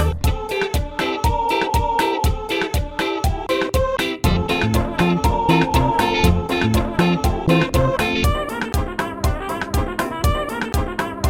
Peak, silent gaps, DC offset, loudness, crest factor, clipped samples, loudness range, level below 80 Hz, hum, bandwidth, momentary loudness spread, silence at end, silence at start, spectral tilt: -2 dBFS; none; under 0.1%; -20 LUFS; 16 dB; under 0.1%; 3 LU; -26 dBFS; none; 18.5 kHz; 6 LU; 0 s; 0 s; -5.5 dB/octave